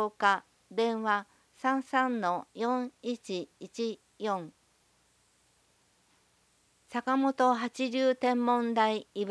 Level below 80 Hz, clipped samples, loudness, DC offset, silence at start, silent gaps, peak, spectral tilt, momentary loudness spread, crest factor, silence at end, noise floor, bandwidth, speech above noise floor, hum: -82 dBFS; under 0.1%; -31 LUFS; under 0.1%; 0 s; none; -10 dBFS; -4.5 dB/octave; 11 LU; 22 dB; 0 s; -69 dBFS; 11 kHz; 39 dB; 60 Hz at -70 dBFS